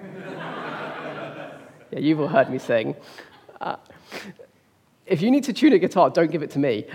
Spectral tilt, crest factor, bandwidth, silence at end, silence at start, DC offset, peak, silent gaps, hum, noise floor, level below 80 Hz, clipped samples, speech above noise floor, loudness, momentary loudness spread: -6.5 dB/octave; 20 dB; 14.5 kHz; 0 s; 0 s; under 0.1%; -4 dBFS; none; none; -61 dBFS; -76 dBFS; under 0.1%; 39 dB; -22 LUFS; 20 LU